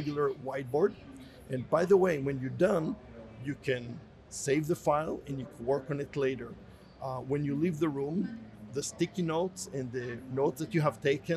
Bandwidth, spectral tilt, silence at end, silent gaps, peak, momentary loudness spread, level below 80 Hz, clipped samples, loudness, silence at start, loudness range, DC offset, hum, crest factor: 13.5 kHz; -6 dB/octave; 0 s; none; -14 dBFS; 14 LU; -62 dBFS; under 0.1%; -32 LUFS; 0 s; 3 LU; under 0.1%; none; 18 dB